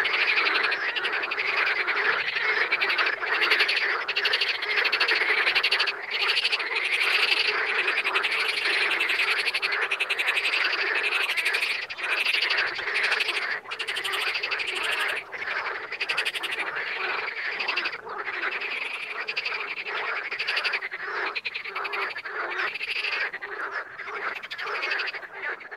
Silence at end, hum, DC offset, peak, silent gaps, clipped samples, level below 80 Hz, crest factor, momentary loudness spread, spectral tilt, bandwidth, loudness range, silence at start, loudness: 0 s; none; under 0.1%; -8 dBFS; none; under 0.1%; -76 dBFS; 20 dB; 9 LU; 0 dB/octave; 16 kHz; 7 LU; 0 s; -25 LUFS